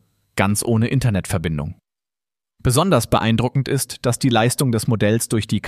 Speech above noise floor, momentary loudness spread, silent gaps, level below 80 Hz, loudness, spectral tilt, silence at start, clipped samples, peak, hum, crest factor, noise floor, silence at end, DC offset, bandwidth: over 72 dB; 7 LU; none; -42 dBFS; -19 LUFS; -5.5 dB/octave; 0.35 s; under 0.1%; -2 dBFS; none; 18 dB; under -90 dBFS; 0 s; under 0.1%; 15.5 kHz